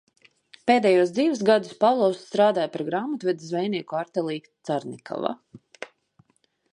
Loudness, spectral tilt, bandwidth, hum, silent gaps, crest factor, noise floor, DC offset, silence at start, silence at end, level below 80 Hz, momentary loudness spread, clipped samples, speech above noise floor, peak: -24 LUFS; -5.5 dB/octave; 10.5 kHz; none; none; 20 dB; -69 dBFS; under 0.1%; 0.65 s; 0.9 s; -76 dBFS; 14 LU; under 0.1%; 45 dB; -4 dBFS